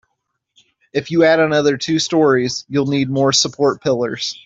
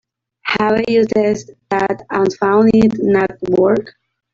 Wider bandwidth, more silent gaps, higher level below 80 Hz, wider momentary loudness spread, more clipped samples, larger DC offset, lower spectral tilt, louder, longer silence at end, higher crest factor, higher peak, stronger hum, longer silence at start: about the same, 8 kHz vs 7.6 kHz; neither; second, -58 dBFS vs -48 dBFS; about the same, 6 LU vs 8 LU; neither; neither; second, -4 dB/octave vs -6.5 dB/octave; about the same, -16 LUFS vs -15 LUFS; second, 0.15 s vs 0.45 s; about the same, 14 dB vs 14 dB; about the same, -2 dBFS vs 0 dBFS; neither; first, 0.95 s vs 0.45 s